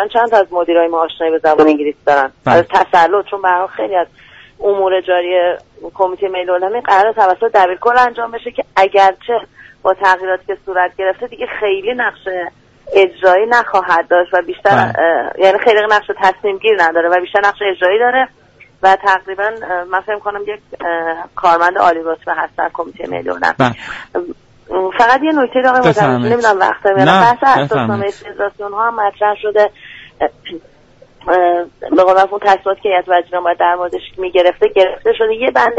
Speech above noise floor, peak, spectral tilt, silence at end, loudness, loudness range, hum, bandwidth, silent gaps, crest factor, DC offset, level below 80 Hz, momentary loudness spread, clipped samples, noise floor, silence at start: 32 dB; 0 dBFS; -5.5 dB/octave; 0 s; -13 LUFS; 5 LU; none; 8 kHz; none; 14 dB; under 0.1%; -50 dBFS; 11 LU; under 0.1%; -45 dBFS; 0 s